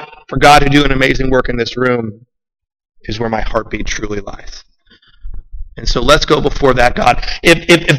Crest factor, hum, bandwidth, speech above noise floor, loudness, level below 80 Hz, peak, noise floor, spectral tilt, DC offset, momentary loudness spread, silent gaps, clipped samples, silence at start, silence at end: 14 dB; none; 15.5 kHz; 36 dB; -12 LUFS; -24 dBFS; 0 dBFS; -48 dBFS; -4.5 dB/octave; under 0.1%; 16 LU; none; under 0.1%; 0 s; 0 s